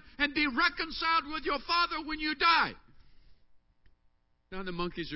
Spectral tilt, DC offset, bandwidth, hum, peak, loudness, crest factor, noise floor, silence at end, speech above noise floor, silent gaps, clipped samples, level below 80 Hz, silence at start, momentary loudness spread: -6.5 dB/octave; under 0.1%; 5.8 kHz; none; -12 dBFS; -29 LUFS; 20 dB; -69 dBFS; 0 s; 38 dB; none; under 0.1%; -54 dBFS; 0.05 s; 11 LU